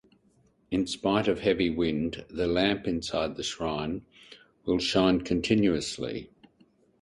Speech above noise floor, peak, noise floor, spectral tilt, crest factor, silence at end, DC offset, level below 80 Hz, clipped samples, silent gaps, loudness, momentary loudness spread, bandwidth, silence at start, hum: 38 dB; -8 dBFS; -65 dBFS; -5 dB/octave; 20 dB; 0.75 s; under 0.1%; -52 dBFS; under 0.1%; none; -28 LUFS; 10 LU; 11.5 kHz; 0.7 s; none